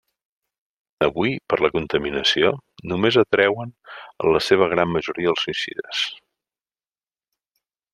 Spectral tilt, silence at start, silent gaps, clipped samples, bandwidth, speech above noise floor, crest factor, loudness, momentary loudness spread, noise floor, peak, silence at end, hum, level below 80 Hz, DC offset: -5 dB/octave; 1 s; none; under 0.1%; 12.5 kHz; over 69 dB; 20 dB; -21 LUFS; 11 LU; under -90 dBFS; -2 dBFS; 1.8 s; none; -54 dBFS; under 0.1%